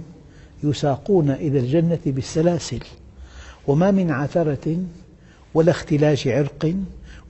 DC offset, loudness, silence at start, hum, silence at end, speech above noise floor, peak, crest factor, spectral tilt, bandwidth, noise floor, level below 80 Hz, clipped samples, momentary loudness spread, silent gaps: under 0.1%; -21 LUFS; 0 s; none; 0 s; 28 dB; -4 dBFS; 16 dB; -7 dB/octave; 8.4 kHz; -47 dBFS; -46 dBFS; under 0.1%; 12 LU; none